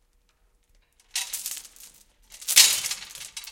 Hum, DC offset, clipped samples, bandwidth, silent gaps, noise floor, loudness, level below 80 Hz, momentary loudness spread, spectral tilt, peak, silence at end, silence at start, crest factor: none; under 0.1%; under 0.1%; 17 kHz; none; -65 dBFS; -21 LUFS; -64 dBFS; 21 LU; 4 dB/octave; 0 dBFS; 0 s; 1.15 s; 28 dB